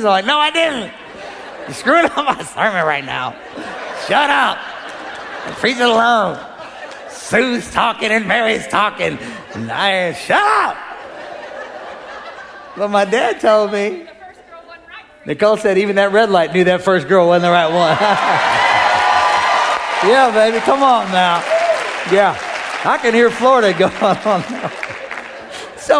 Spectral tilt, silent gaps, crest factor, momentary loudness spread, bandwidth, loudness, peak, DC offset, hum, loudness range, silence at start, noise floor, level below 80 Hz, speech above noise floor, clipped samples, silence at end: -4 dB/octave; none; 14 dB; 18 LU; 11 kHz; -14 LUFS; 0 dBFS; under 0.1%; none; 6 LU; 0 s; -38 dBFS; -54 dBFS; 24 dB; under 0.1%; 0 s